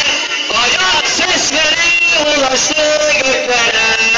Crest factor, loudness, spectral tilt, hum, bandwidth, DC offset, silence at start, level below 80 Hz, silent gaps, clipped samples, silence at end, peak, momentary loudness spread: 10 dB; -10 LUFS; 0 dB/octave; none; 11.5 kHz; under 0.1%; 0 s; -42 dBFS; none; under 0.1%; 0 s; -4 dBFS; 3 LU